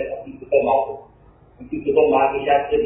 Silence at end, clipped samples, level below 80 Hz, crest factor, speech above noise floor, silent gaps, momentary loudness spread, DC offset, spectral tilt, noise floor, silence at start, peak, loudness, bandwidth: 0 s; under 0.1%; -48 dBFS; 16 dB; 32 dB; none; 15 LU; under 0.1%; -9.5 dB/octave; -50 dBFS; 0 s; -4 dBFS; -19 LUFS; 3.8 kHz